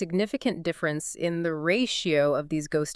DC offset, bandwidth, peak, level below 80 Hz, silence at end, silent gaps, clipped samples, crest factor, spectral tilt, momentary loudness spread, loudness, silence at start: under 0.1%; 12 kHz; -10 dBFS; -60 dBFS; 0 s; none; under 0.1%; 16 dB; -4.5 dB/octave; 5 LU; -27 LUFS; 0 s